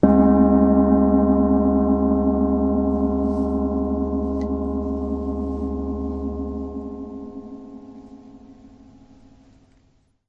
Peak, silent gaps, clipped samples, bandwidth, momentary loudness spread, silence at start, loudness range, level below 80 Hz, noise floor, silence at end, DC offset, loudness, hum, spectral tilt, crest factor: -2 dBFS; none; under 0.1%; 2.3 kHz; 19 LU; 0.05 s; 18 LU; -34 dBFS; -61 dBFS; 1.75 s; under 0.1%; -20 LUFS; none; -11.5 dB/octave; 18 dB